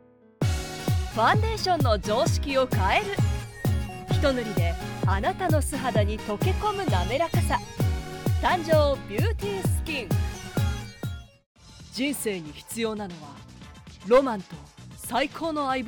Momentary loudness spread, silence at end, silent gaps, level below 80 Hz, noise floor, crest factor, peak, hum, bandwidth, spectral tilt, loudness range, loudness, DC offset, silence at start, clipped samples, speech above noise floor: 15 LU; 0 s; 11.46-11.55 s; -36 dBFS; -45 dBFS; 16 dB; -8 dBFS; none; 19 kHz; -5.5 dB/octave; 6 LU; -26 LUFS; under 0.1%; 0.4 s; under 0.1%; 21 dB